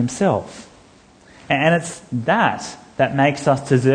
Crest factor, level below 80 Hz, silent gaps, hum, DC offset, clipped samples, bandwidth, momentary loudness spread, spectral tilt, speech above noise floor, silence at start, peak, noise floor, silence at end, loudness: 18 dB; -56 dBFS; none; none; under 0.1%; under 0.1%; 10 kHz; 13 LU; -5.5 dB/octave; 31 dB; 0 s; -2 dBFS; -49 dBFS; 0 s; -19 LUFS